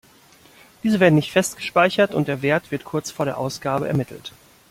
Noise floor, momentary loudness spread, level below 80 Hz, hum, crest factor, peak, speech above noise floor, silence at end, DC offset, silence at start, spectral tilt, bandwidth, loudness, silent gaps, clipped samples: -51 dBFS; 11 LU; -58 dBFS; none; 18 dB; -2 dBFS; 31 dB; 0.4 s; under 0.1%; 0.85 s; -5.5 dB/octave; 16.5 kHz; -21 LUFS; none; under 0.1%